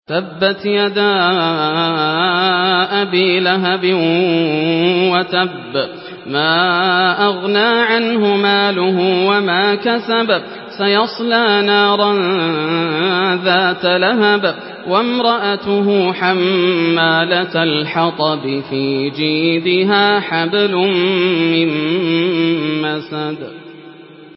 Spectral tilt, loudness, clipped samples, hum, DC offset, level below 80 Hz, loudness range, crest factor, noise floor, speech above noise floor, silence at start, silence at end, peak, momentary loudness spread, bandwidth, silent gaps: -10.5 dB/octave; -14 LUFS; under 0.1%; none; under 0.1%; -64 dBFS; 2 LU; 14 dB; -37 dBFS; 23 dB; 0.1 s; 0.05 s; 0 dBFS; 6 LU; 5.8 kHz; none